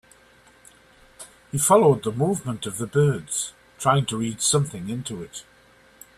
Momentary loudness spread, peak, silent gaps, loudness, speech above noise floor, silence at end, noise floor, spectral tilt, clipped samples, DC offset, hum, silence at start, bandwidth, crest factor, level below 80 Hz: 20 LU; -4 dBFS; none; -23 LUFS; 32 dB; 0.75 s; -55 dBFS; -4.5 dB/octave; under 0.1%; under 0.1%; none; 1.2 s; 15 kHz; 20 dB; -58 dBFS